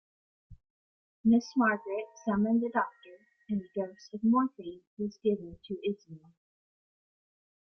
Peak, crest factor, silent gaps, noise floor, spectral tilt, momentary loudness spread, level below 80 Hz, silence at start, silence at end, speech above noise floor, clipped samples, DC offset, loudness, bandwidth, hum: -16 dBFS; 18 dB; 0.70-1.24 s, 4.87-4.97 s; -57 dBFS; -7 dB/octave; 12 LU; -68 dBFS; 0.5 s; 1.6 s; 26 dB; under 0.1%; under 0.1%; -31 LUFS; 6.4 kHz; none